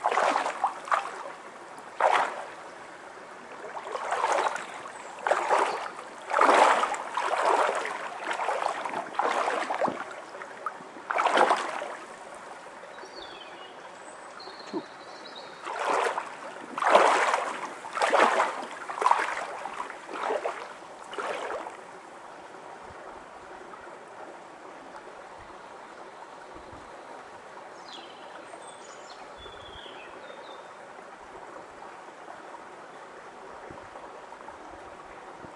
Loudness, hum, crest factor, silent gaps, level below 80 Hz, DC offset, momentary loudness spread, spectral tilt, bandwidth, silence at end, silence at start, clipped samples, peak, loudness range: -28 LUFS; none; 26 dB; none; -72 dBFS; under 0.1%; 21 LU; -2 dB/octave; 11.5 kHz; 0 s; 0 s; under 0.1%; -4 dBFS; 19 LU